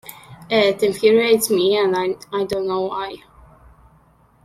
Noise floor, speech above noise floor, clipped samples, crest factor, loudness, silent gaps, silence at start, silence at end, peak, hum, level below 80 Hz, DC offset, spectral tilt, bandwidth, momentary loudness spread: -54 dBFS; 36 dB; under 0.1%; 18 dB; -18 LUFS; none; 0.05 s; 1.25 s; -2 dBFS; none; -56 dBFS; under 0.1%; -3.5 dB/octave; 15.5 kHz; 13 LU